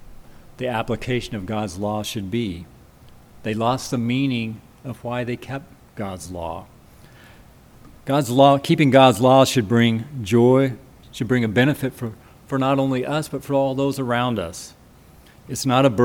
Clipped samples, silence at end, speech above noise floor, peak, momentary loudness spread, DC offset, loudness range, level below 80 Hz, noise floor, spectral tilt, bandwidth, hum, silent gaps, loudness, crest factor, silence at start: under 0.1%; 0 s; 29 dB; 0 dBFS; 18 LU; under 0.1%; 11 LU; -50 dBFS; -48 dBFS; -6 dB/octave; 19 kHz; none; none; -20 LUFS; 20 dB; 0 s